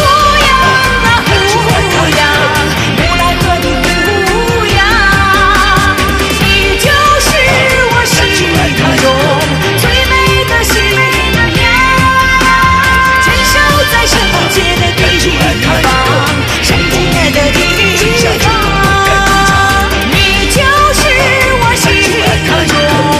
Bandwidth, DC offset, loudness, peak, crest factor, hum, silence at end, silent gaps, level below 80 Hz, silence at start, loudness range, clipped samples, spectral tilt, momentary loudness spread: 16 kHz; 0.2%; -8 LUFS; 0 dBFS; 8 dB; none; 0 s; none; -20 dBFS; 0 s; 2 LU; 0.4%; -3.5 dB/octave; 3 LU